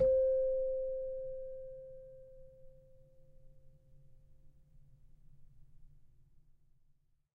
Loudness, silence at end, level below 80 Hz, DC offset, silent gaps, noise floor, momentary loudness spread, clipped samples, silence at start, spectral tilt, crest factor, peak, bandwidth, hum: -36 LUFS; 1.3 s; -58 dBFS; under 0.1%; none; -70 dBFS; 27 LU; under 0.1%; 0 s; -9.5 dB/octave; 20 dB; -20 dBFS; 1.7 kHz; none